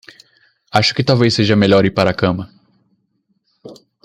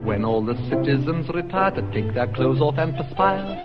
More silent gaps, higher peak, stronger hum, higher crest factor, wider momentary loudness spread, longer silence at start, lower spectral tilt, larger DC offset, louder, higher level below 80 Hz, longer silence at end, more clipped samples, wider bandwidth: neither; first, 0 dBFS vs -4 dBFS; neither; about the same, 16 dB vs 18 dB; first, 8 LU vs 5 LU; first, 0.75 s vs 0 s; second, -6 dB/octave vs -9.5 dB/octave; neither; first, -14 LUFS vs -22 LUFS; second, -50 dBFS vs -42 dBFS; first, 0.3 s vs 0 s; neither; first, 12 kHz vs 5.6 kHz